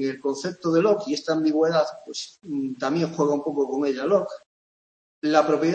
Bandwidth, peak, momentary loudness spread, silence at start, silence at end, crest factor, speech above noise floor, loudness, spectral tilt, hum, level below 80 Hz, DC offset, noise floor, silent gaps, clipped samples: 8.6 kHz; -4 dBFS; 12 LU; 0 s; 0 s; 20 dB; over 67 dB; -24 LUFS; -5.5 dB/octave; none; -72 dBFS; under 0.1%; under -90 dBFS; 4.46-5.22 s; under 0.1%